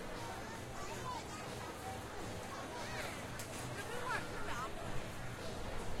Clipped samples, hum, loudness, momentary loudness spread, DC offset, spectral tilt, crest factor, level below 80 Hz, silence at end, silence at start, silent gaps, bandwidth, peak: under 0.1%; none; -44 LUFS; 5 LU; under 0.1%; -4 dB/octave; 16 dB; -54 dBFS; 0 s; 0 s; none; 16.5 kHz; -28 dBFS